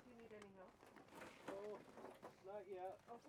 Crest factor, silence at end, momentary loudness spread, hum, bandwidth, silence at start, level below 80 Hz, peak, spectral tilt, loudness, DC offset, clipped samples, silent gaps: 18 dB; 0 s; 10 LU; none; 15.5 kHz; 0 s; -86 dBFS; -40 dBFS; -5 dB/octave; -57 LUFS; under 0.1%; under 0.1%; none